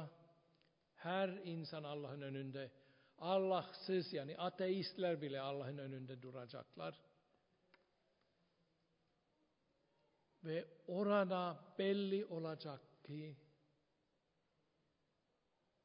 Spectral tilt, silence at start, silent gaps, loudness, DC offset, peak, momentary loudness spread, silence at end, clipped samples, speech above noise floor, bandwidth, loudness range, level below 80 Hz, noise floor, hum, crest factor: -5 dB/octave; 0 s; none; -44 LUFS; under 0.1%; -24 dBFS; 15 LU; 2.45 s; under 0.1%; 41 dB; 5.2 kHz; 15 LU; under -90 dBFS; -84 dBFS; none; 22 dB